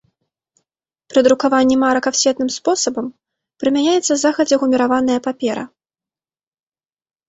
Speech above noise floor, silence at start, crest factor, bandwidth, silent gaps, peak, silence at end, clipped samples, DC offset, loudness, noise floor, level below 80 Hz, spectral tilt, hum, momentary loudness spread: over 74 dB; 1.1 s; 16 dB; 8.2 kHz; none; -2 dBFS; 1.6 s; under 0.1%; under 0.1%; -16 LUFS; under -90 dBFS; -58 dBFS; -2.5 dB/octave; none; 9 LU